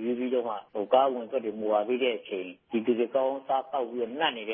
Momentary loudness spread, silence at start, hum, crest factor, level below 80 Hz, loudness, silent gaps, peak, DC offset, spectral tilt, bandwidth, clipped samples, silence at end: 10 LU; 0 s; none; 20 dB; -82 dBFS; -29 LUFS; none; -8 dBFS; under 0.1%; -8.5 dB/octave; 3.7 kHz; under 0.1%; 0 s